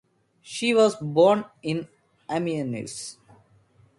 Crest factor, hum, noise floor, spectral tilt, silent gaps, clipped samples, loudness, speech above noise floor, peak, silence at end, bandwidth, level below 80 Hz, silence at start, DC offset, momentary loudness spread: 20 dB; none; -59 dBFS; -5 dB/octave; none; under 0.1%; -24 LUFS; 36 dB; -6 dBFS; 0.85 s; 11.5 kHz; -66 dBFS; 0.45 s; under 0.1%; 17 LU